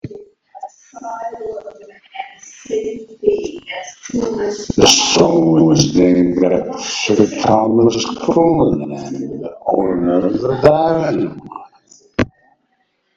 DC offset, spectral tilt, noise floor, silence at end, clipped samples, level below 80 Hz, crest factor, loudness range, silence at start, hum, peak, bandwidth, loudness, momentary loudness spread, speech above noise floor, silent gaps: under 0.1%; -4.5 dB/octave; -64 dBFS; 0.9 s; 0.1%; -44 dBFS; 16 dB; 11 LU; 0.05 s; none; 0 dBFS; 8.2 kHz; -15 LUFS; 21 LU; 50 dB; none